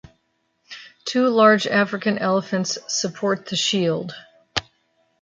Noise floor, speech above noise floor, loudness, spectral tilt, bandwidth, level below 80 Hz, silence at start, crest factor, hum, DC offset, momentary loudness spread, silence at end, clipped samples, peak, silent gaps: -69 dBFS; 49 dB; -21 LUFS; -4 dB/octave; 9.4 kHz; -60 dBFS; 0.7 s; 20 dB; none; under 0.1%; 20 LU; 0.6 s; under 0.1%; -2 dBFS; none